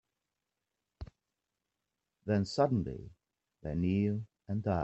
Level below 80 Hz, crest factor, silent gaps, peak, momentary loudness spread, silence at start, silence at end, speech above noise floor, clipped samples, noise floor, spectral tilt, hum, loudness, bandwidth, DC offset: -58 dBFS; 20 dB; none; -16 dBFS; 21 LU; 1 s; 0 s; 56 dB; under 0.1%; -88 dBFS; -8 dB/octave; none; -34 LUFS; 8.2 kHz; under 0.1%